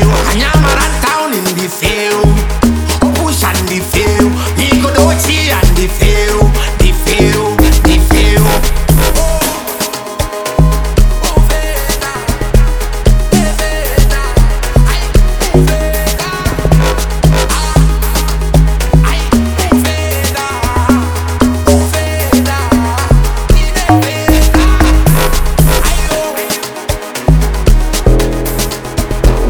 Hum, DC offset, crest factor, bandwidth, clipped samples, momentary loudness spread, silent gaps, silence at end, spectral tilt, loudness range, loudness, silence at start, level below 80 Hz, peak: none; under 0.1%; 10 dB; over 20 kHz; under 0.1%; 6 LU; none; 0 s; -5 dB/octave; 3 LU; -11 LUFS; 0 s; -12 dBFS; 0 dBFS